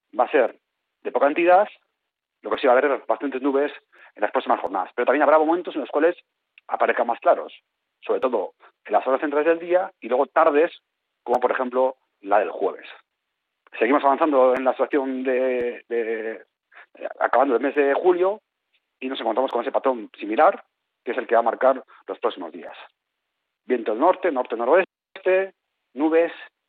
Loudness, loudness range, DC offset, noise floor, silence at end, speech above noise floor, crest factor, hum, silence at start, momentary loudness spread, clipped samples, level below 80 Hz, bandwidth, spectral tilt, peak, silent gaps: -22 LUFS; 3 LU; under 0.1%; -81 dBFS; 0.2 s; 60 dB; 16 dB; none; 0.15 s; 16 LU; under 0.1%; -74 dBFS; 4.5 kHz; -2 dB/octave; -6 dBFS; none